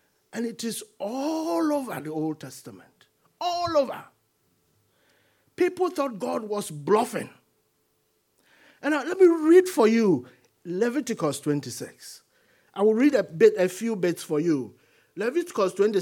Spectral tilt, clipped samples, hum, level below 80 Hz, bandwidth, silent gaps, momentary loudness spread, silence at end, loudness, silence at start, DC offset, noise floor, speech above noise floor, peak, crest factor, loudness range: -5.5 dB/octave; under 0.1%; none; -74 dBFS; 17.5 kHz; none; 18 LU; 0 s; -25 LUFS; 0.35 s; under 0.1%; -71 dBFS; 47 dB; -6 dBFS; 20 dB; 8 LU